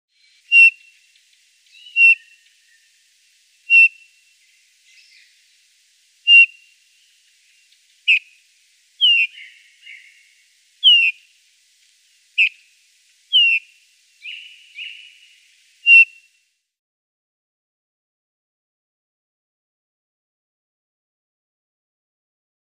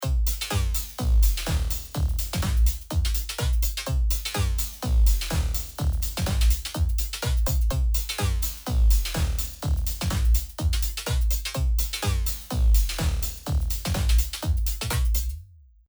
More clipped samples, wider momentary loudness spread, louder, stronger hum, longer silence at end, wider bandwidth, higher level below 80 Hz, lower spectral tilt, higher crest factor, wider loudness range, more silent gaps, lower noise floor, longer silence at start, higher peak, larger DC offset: neither; first, 24 LU vs 5 LU; first, -12 LUFS vs -26 LUFS; neither; first, 6.65 s vs 0.45 s; second, 11.5 kHz vs over 20 kHz; second, under -90 dBFS vs -24 dBFS; second, 11 dB/octave vs -4 dB/octave; first, 20 dB vs 14 dB; first, 4 LU vs 1 LU; neither; first, -66 dBFS vs -46 dBFS; first, 0.5 s vs 0 s; first, -2 dBFS vs -10 dBFS; neither